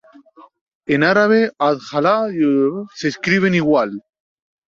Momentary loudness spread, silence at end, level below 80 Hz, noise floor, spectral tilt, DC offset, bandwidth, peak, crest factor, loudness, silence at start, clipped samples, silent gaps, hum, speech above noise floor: 10 LU; 0.8 s; -60 dBFS; -46 dBFS; -6.5 dB/octave; under 0.1%; 7.6 kHz; -2 dBFS; 16 dB; -17 LUFS; 0.9 s; under 0.1%; none; none; 30 dB